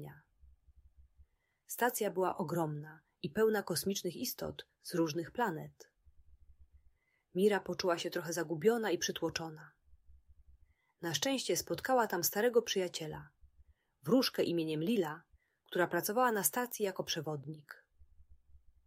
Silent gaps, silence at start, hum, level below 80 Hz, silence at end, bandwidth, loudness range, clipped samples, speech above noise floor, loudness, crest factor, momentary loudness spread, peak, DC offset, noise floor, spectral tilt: none; 0 s; none; -68 dBFS; 0.3 s; 16 kHz; 4 LU; under 0.1%; 36 dB; -35 LUFS; 24 dB; 15 LU; -14 dBFS; under 0.1%; -71 dBFS; -4 dB/octave